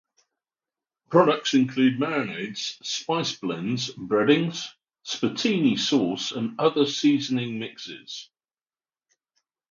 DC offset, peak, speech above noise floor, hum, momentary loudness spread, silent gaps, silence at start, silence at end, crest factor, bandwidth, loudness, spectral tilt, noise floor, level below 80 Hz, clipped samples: under 0.1%; -4 dBFS; over 66 dB; none; 14 LU; none; 1.1 s; 1.5 s; 22 dB; 7.4 kHz; -24 LUFS; -4.5 dB/octave; under -90 dBFS; -72 dBFS; under 0.1%